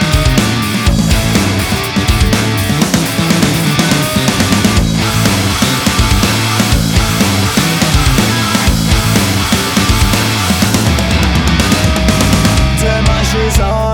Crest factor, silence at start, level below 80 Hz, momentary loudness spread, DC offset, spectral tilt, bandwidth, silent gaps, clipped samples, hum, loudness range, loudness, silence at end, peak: 10 dB; 0 s; -18 dBFS; 2 LU; under 0.1%; -4.5 dB/octave; over 20 kHz; none; under 0.1%; none; 1 LU; -11 LUFS; 0 s; 0 dBFS